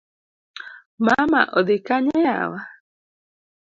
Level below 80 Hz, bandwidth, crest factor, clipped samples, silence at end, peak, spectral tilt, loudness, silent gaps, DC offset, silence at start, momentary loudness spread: -60 dBFS; 7.6 kHz; 22 dB; under 0.1%; 0.95 s; 0 dBFS; -6 dB/octave; -19 LUFS; 0.86-0.98 s; under 0.1%; 0.55 s; 21 LU